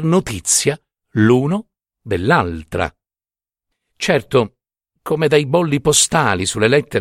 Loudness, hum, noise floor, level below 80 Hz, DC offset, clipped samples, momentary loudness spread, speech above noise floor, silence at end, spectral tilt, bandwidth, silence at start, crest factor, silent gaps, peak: -16 LUFS; none; under -90 dBFS; -44 dBFS; under 0.1%; under 0.1%; 11 LU; over 74 dB; 0 s; -4 dB/octave; 16 kHz; 0 s; 18 dB; none; 0 dBFS